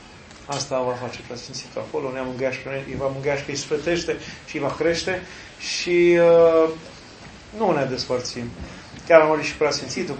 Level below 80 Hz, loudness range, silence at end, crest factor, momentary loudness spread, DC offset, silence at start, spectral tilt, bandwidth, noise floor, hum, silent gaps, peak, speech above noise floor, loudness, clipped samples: -50 dBFS; 7 LU; 0 s; 22 dB; 22 LU; under 0.1%; 0 s; -4.5 dB/octave; 8.8 kHz; -42 dBFS; none; none; 0 dBFS; 21 dB; -22 LUFS; under 0.1%